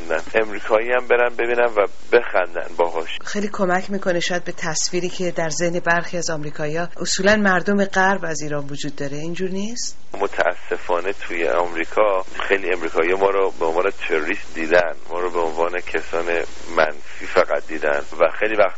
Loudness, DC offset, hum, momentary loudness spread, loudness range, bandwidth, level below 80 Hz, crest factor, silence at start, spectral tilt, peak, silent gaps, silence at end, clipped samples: -21 LUFS; 6%; none; 8 LU; 3 LU; 8 kHz; -50 dBFS; 18 dB; 0 s; -3 dB/octave; -2 dBFS; none; 0 s; under 0.1%